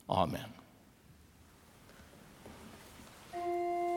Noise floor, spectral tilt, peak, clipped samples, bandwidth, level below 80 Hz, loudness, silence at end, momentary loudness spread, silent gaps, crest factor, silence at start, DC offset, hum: -61 dBFS; -6 dB/octave; -16 dBFS; under 0.1%; 18 kHz; -68 dBFS; -37 LUFS; 0 s; 26 LU; none; 24 dB; 0.1 s; under 0.1%; none